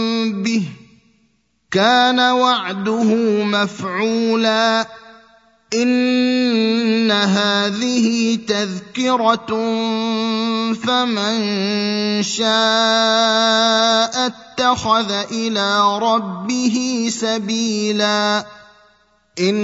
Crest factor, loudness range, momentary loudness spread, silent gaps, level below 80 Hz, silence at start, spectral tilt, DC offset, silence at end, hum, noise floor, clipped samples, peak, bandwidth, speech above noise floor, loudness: 18 dB; 3 LU; 7 LU; none; -60 dBFS; 0 s; -3.5 dB/octave; under 0.1%; 0 s; none; -62 dBFS; under 0.1%; 0 dBFS; 8 kHz; 45 dB; -17 LUFS